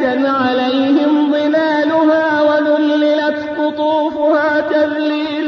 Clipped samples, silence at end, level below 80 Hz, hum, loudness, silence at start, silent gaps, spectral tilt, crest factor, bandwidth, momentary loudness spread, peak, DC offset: under 0.1%; 0 s; -58 dBFS; none; -14 LUFS; 0 s; none; -5.5 dB/octave; 10 dB; 6.4 kHz; 4 LU; -4 dBFS; under 0.1%